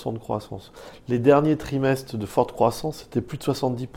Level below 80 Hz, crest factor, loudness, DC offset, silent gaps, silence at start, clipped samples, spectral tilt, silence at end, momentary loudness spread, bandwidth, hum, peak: -50 dBFS; 20 dB; -24 LUFS; under 0.1%; none; 0 s; under 0.1%; -7 dB/octave; 0 s; 17 LU; 17 kHz; none; -4 dBFS